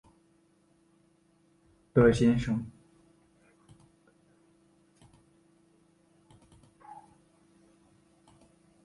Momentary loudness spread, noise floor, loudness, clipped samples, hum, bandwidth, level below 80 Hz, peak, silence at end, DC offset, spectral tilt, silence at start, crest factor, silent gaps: 29 LU; -67 dBFS; -26 LUFS; under 0.1%; none; 11 kHz; -54 dBFS; -10 dBFS; 1.9 s; under 0.1%; -7.5 dB/octave; 1.95 s; 24 dB; none